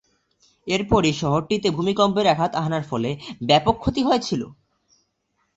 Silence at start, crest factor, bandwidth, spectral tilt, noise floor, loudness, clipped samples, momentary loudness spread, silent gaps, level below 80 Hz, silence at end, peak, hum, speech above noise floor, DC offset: 0.65 s; 20 dB; 8.2 kHz; -5.5 dB/octave; -71 dBFS; -21 LUFS; under 0.1%; 10 LU; none; -44 dBFS; 1.05 s; -4 dBFS; none; 51 dB; under 0.1%